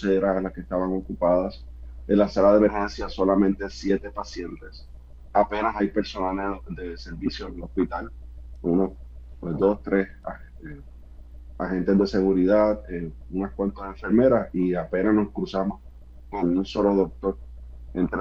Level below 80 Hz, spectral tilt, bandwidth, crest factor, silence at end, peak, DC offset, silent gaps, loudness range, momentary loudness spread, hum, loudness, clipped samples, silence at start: -42 dBFS; -7.5 dB/octave; 7.4 kHz; 18 dB; 0 s; -6 dBFS; under 0.1%; none; 5 LU; 20 LU; none; -24 LUFS; under 0.1%; 0 s